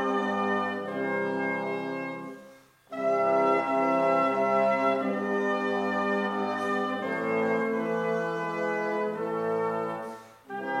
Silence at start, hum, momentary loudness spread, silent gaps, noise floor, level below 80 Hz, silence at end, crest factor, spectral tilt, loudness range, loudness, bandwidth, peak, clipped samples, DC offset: 0 s; none; 10 LU; none; -53 dBFS; -78 dBFS; 0 s; 16 dB; -6.5 dB/octave; 4 LU; -28 LUFS; 13 kHz; -12 dBFS; under 0.1%; under 0.1%